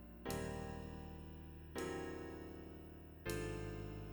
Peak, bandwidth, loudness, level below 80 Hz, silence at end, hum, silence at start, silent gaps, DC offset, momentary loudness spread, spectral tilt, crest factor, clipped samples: -28 dBFS; over 20 kHz; -48 LUFS; -56 dBFS; 0 s; none; 0 s; none; under 0.1%; 10 LU; -5.5 dB/octave; 18 dB; under 0.1%